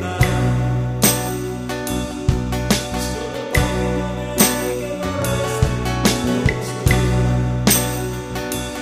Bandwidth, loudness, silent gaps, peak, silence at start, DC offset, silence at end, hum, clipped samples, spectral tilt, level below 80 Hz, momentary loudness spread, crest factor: 15.5 kHz; -19 LUFS; none; 0 dBFS; 0 s; under 0.1%; 0 s; none; under 0.1%; -4.5 dB/octave; -28 dBFS; 9 LU; 18 dB